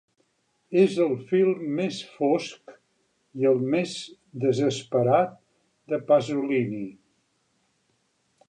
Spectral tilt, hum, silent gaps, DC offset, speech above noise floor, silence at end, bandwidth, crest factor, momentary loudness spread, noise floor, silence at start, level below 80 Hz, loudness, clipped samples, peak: -6.5 dB/octave; none; none; under 0.1%; 47 dB; 1.55 s; 10 kHz; 18 dB; 12 LU; -71 dBFS; 0.7 s; -74 dBFS; -25 LUFS; under 0.1%; -8 dBFS